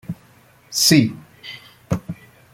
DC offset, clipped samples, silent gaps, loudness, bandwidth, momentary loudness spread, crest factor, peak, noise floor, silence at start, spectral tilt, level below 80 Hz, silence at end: under 0.1%; under 0.1%; none; -18 LUFS; 16.5 kHz; 23 LU; 20 dB; -2 dBFS; -52 dBFS; 0.1 s; -3.5 dB/octave; -52 dBFS; 0.4 s